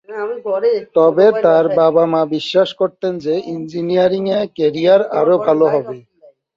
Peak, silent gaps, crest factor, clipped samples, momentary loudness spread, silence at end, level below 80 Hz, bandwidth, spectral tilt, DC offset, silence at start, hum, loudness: 0 dBFS; none; 14 dB; under 0.1%; 10 LU; 0.55 s; -62 dBFS; 7.4 kHz; -7 dB/octave; under 0.1%; 0.1 s; none; -15 LUFS